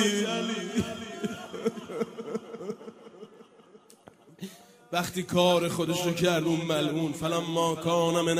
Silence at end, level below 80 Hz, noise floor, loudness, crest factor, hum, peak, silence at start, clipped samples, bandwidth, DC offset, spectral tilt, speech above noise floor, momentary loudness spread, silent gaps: 0 s; -64 dBFS; -55 dBFS; -29 LUFS; 20 dB; none; -10 dBFS; 0 s; under 0.1%; 15.5 kHz; under 0.1%; -4.5 dB/octave; 29 dB; 19 LU; none